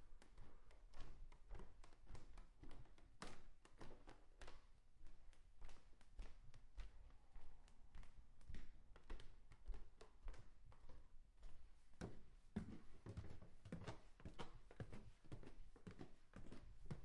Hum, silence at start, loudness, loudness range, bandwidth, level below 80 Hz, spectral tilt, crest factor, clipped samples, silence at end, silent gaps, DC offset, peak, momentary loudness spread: none; 0 s; -63 LUFS; 8 LU; 11 kHz; -62 dBFS; -6 dB/octave; 18 dB; under 0.1%; 0 s; none; under 0.1%; -36 dBFS; 11 LU